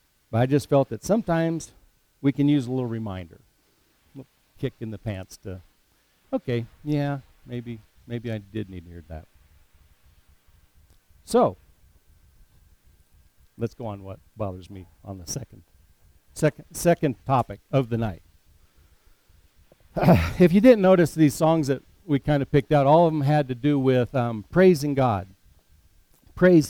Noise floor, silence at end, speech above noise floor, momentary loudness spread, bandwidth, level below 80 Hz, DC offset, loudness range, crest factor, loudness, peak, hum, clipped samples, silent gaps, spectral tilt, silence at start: -64 dBFS; 0 s; 42 dB; 21 LU; 18 kHz; -48 dBFS; under 0.1%; 17 LU; 22 dB; -23 LUFS; -4 dBFS; none; under 0.1%; none; -7 dB/octave; 0.3 s